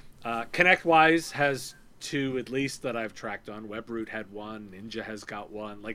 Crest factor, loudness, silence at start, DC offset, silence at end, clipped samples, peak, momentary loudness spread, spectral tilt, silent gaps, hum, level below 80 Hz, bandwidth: 22 dB; -27 LUFS; 0.05 s; under 0.1%; 0 s; under 0.1%; -6 dBFS; 19 LU; -4.5 dB/octave; none; none; -58 dBFS; 16 kHz